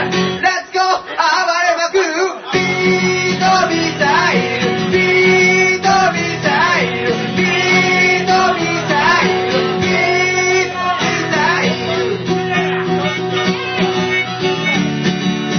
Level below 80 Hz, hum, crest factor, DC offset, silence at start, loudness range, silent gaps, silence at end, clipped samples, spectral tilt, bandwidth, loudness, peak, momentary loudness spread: -50 dBFS; none; 12 dB; under 0.1%; 0 s; 4 LU; none; 0 s; under 0.1%; -4 dB/octave; 6.6 kHz; -14 LUFS; -2 dBFS; 6 LU